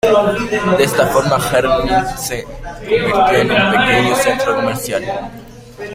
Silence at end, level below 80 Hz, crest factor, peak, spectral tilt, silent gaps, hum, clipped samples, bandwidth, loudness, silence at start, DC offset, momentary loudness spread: 0 s; -36 dBFS; 14 dB; -2 dBFS; -4.5 dB/octave; none; none; under 0.1%; 16.5 kHz; -14 LUFS; 0.05 s; under 0.1%; 13 LU